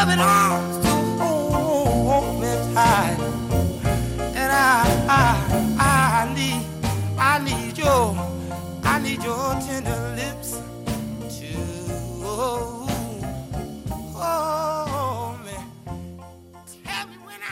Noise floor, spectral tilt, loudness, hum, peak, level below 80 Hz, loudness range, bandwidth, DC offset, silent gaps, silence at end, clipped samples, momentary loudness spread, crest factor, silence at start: -44 dBFS; -5 dB/octave; -22 LUFS; none; -6 dBFS; -36 dBFS; 9 LU; 16 kHz; under 0.1%; none; 0 s; under 0.1%; 15 LU; 16 dB; 0 s